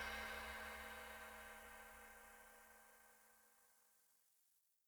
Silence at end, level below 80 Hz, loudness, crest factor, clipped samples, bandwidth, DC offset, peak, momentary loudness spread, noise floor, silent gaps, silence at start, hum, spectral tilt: 0.3 s; -70 dBFS; -54 LUFS; 20 dB; under 0.1%; over 20 kHz; under 0.1%; -36 dBFS; 18 LU; -81 dBFS; none; 0 s; none; -2 dB/octave